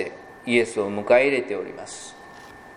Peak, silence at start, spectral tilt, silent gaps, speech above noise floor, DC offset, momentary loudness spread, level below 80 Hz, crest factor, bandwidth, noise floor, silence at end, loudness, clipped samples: -4 dBFS; 0 s; -4.5 dB/octave; none; 21 dB; under 0.1%; 24 LU; -64 dBFS; 20 dB; 11.5 kHz; -44 dBFS; 0 s; -22 LUFS; under 0.1%